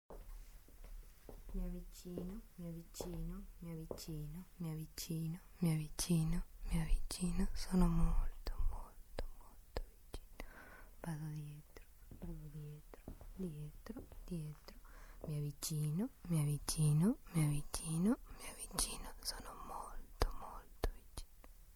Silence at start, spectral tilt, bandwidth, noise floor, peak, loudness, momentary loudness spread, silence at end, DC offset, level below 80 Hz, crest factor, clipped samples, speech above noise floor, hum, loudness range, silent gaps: 0.1 s; -5.5 dB/octave; over 20 kHz; -60 dBFS; -16 dBFS; -42 LUFS; 21 LU; 0 s; under 0.1%; -46 dBFS; 26 dB; under 0.1%; 20 dB; none; 13 LU; none